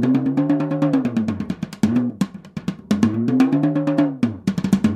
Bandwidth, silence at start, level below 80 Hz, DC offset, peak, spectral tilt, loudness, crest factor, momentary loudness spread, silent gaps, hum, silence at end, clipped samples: 13.5 kHz; 0 s; -52 dBFS; under 0.1%; -4 dBFS; -7.5 dB/octave; -20 LUFS; 16 dB; 9 LU; none; none; 0 s; under 0.1%